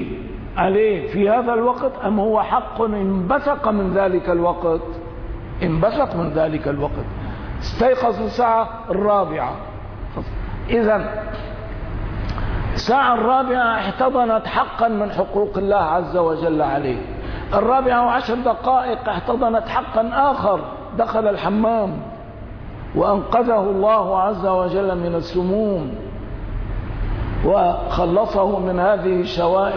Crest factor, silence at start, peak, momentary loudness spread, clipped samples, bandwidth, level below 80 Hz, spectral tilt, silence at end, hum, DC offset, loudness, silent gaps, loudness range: 14 dB; 0 s; -6 dBFS; 13 LU; under 0.1%; 5.4 kHz; -32 dBFS; -8 dB/octave; 0 s; none; under 0.1%; -19 LUFS; none; 3 LU